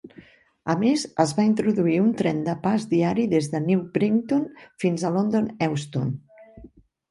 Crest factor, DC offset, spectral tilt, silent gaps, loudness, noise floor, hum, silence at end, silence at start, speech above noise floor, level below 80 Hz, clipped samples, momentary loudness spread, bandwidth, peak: 18 dB; under 0.1%; -6.5 dB/octave; none; -23 LUFS; -51 dBFS; none; 0.45 s; 0.05 s; 29 dB; -60 dBFS; under 0.1%; 7 LU; 11.5 kHz; -6 dBFS